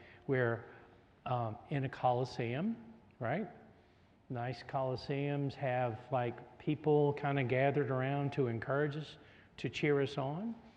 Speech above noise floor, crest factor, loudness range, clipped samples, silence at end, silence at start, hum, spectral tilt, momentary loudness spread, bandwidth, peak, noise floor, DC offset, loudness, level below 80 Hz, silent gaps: 30 dB; 18 dB; 5 LU; under 0.1%; 0.05 s; 0 s; none; -8 dB/octave; 12 LU; 8.2 kHz; -18 dBFS; -65 dBFS; under 0.1%; -36 LUFS; -72 dBFS; none